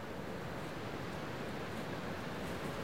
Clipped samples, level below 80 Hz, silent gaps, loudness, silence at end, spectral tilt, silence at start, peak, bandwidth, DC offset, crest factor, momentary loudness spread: under 0.1%; -60 dBFS; none; -43 LUFS; 0 s; -5.5 dB/octave; 0 s; -28 dBFS; 16 kHz; 0.3%; 14 dB; 2 LU